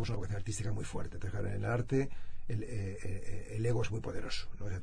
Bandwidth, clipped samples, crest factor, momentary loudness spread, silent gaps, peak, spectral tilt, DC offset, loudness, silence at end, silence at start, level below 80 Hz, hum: 10.5 kHz; under 0.1%; 14 dB; 9 LU; none; -20 dBFS; -6 dB/octave; under 0.1%; -38 LUFS; 0 s; 0 s; -46 dBFS; none